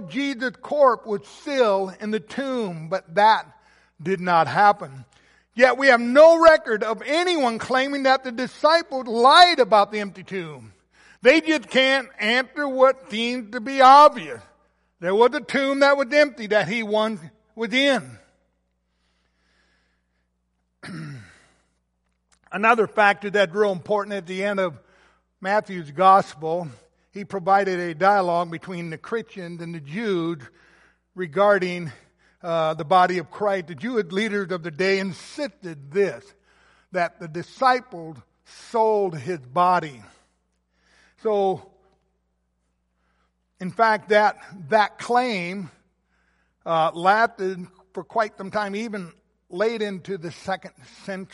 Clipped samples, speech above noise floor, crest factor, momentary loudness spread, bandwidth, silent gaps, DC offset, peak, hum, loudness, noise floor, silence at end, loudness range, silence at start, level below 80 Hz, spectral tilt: under 0.1%; 51 dB; 20 dB; 18 LU; 11.5 kHz; none; under 0.1%; -2 dBFS; none; -20 LUFS; -72 dBFS; 0.1 s; 9 LU; 0 s; -64 dBFS; -4.5 dB/octave